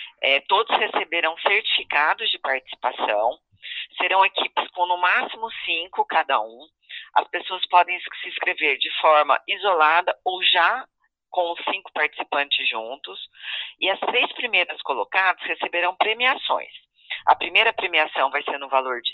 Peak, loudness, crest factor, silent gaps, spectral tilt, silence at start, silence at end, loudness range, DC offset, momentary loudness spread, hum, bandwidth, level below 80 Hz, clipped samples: -2 dBFS; -21 LUFS; 20 dB; none; -3 dB/octave; 0 s; 0 s; 4 LU; under 0.1%; 12 LU; none; 6 kHz; -72 dBFS; under 0.1%